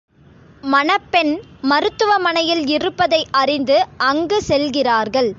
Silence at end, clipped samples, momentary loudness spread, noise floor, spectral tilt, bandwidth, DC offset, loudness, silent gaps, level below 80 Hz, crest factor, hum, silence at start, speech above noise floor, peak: 0.05 s; under 0.1%; 3 LU; -46 dBFS; -4 dB/octave; 7.8 kHz; under 0.1%; -17 LUFS; none; -50 dBFS; 16 dB; none; 0.65 s; 30 dB; -2 dBFS